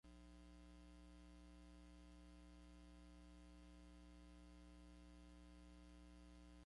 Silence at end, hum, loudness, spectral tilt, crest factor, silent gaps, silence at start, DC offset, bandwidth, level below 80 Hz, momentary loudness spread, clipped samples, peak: 0 s; 60 Hz at -65 dBFS; -65 LUFS; -5.5 dB/octave; 10 dB; none; 0.05 s; under 0.1%; 11 kHz; -66 dBFS; 0 LU; under 0.1%; -52 dBFS